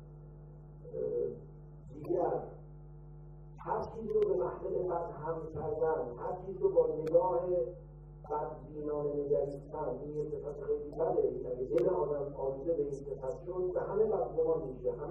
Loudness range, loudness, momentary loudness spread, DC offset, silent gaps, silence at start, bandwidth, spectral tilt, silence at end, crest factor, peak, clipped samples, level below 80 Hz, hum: 5 LU; -35 LUFS; 21 LU; under 0.1%; none; 0 s; 6.6 kHz; -10 dB/octave; 0 s; 20 dB; -16 dBFS; under 0.1%; -54 dBFS; none